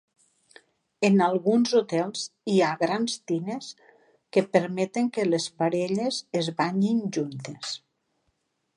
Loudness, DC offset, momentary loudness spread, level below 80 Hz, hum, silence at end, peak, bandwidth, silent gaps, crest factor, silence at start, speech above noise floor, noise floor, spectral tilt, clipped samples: -26 LUFS; under 0.1%; 12 LU; -76 dBFS; none; 1 s; -8 dBFS; 11 kHz; none; 18 dB; 1 s; 50 dB; -75 dBFS; -5.5 dB/octave; under 0.1%